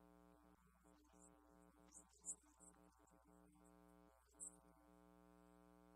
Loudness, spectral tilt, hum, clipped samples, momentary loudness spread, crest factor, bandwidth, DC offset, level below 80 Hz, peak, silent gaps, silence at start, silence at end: -58 LUFS; -3 dB/octave; none; under 0.1%; 14 LU; 28 dB; 14 kHz; under 0.1%; -80 dBFS; -38 dBFS; none; 0 s; 0 s